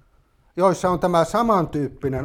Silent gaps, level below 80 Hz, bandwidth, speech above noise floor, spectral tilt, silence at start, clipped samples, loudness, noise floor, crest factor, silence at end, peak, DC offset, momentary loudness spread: none; -46 dBFS; 16.5 kHz; 39 dB; -6.5 dB/octave; 0.55 s; under 0.1%; -20 LUFS; -59 dBFS; 16 dB; 0 s; -4 dBFS; under 0.1%; 7 LU